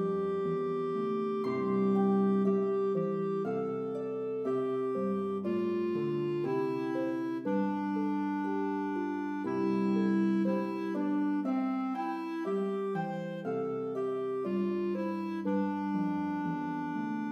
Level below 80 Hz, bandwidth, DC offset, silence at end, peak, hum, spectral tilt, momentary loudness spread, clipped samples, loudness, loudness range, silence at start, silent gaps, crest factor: -80 dBFS; 6.6 kHz; under 0.1%; 0 s; -18 dBFS; none; -9 dB/octave; 6 LU; under 0.1%; -32 LUFS; 3 LU; 0 s; none; 14 dB